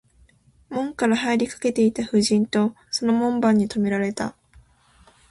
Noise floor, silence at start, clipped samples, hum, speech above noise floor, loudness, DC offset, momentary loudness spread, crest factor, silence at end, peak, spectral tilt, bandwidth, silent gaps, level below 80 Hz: -57 dBFS; 0.7 s; under 0.1%; none; 36 dB; -22 LUFS; under 0.1%; 9 LU; 16 dB; 1 s; -8 dBFS; -5 dB/octave; 11.5 kHz; none; -56 dBFS